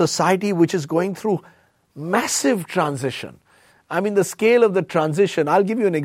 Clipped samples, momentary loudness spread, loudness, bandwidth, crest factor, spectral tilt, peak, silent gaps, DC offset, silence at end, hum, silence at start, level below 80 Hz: under 0.1%; 10 LU; -20 LUFS; 16.5 kHz; 16 dB; -5 dB/octave; -4 dBFS; none; under 0.1%; 0 s; none; 0 s; -66 dBFS